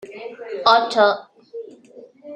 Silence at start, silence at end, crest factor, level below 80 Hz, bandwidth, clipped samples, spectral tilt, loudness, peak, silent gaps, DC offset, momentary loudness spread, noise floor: 0.05 s; 0 s; 20 dB; -68 dBFS; 9.8 kHz; under 0.1%; -3 dB/octave; -17 LUFS; -2 dBFS; none; under 0.1%; 22 LU; -45 dBFS